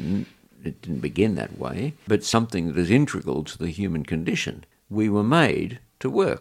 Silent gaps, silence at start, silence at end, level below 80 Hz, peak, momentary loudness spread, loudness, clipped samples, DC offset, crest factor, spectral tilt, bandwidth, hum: none; 0 s; 0 s; -50 dBFS; -4 dBFS; 12 LU; -24 LUFS; under 0.1%; under 0.1%; 20 dB; -6 dB/octave; 15 kHz; none